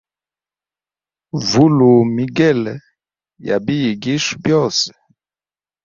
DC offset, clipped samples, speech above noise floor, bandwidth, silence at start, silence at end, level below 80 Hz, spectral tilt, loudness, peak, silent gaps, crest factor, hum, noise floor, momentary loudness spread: under 0.1%; under 0.1%; over 75 dB; 7.6 kHz; 1.35 s; 0.95 s; -54 dBFS; -5.5 dB/octave; -15 LUFS; 0 dBFS; none; 16 dB; 50 Hz at -45 dBFS; under -90 dBFS; 13 LU